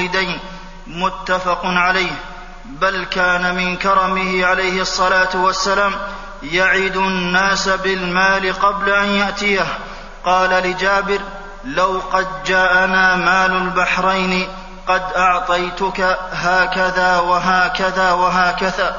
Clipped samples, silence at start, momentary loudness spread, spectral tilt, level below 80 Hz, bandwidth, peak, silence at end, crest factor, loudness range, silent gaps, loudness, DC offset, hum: under 0.1%; 0 s; 9 LU; -3.5 dB/octave; -36 dBFS; 7.4 kHz; 0 dBFS; 0 s; 16 dB; 2 LU; none; -16 LUFS; 0.4%; none